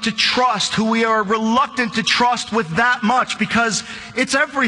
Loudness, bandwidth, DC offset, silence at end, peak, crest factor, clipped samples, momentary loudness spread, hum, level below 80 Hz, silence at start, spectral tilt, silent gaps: -17 LUFS; 11 kHz; under 0.1%; 0 s; -2 dBFS; 16 dB; under 0.1%; 5 LU; none; -52 dBFS; 0 s; -3 dB/octave; none